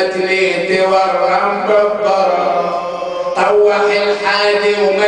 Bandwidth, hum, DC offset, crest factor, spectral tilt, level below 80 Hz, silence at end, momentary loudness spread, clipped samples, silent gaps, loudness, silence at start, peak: 10 kHz; none; under 0.1%; 12 dB; -4 dB/octave; -54 dBFS; 0 s; 6 LU; under 0.1%; none; -13 LUFS; 0 s; 0 dBFS